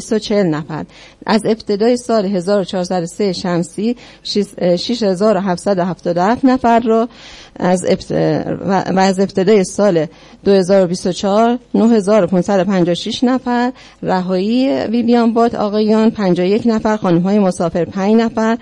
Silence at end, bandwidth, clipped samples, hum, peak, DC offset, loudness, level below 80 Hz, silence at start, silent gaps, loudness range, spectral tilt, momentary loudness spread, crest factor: 0 s; 11.5 kHz; under 0.1%; none; -2 dBFS; under 0.1%; -15 LUFS; -48 dBFS; 0 s; none; 3 LU; -6 dB/octave; 7 LU; 12 dB